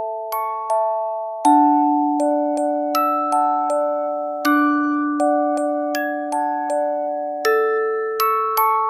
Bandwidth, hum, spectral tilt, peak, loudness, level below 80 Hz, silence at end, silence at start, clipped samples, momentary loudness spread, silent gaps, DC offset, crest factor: 16 kHz; none; -2.5 dB/octave; -4 dBFS; -19 LUFS; -78 dBFS; 0 s; 0 s; under 0.1%; 7 LU; none; under 0.1%; 16 dB